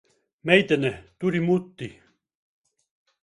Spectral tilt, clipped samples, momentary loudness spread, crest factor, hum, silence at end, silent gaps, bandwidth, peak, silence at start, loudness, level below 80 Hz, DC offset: -6.5 dB/octave; under 0.1%; 19 LU; 26 dB; none; 1.3 s; none; 11 kHz; 0 dBFS; 0.45 s; -23 LUFS; -62 dBFS; under 0.1%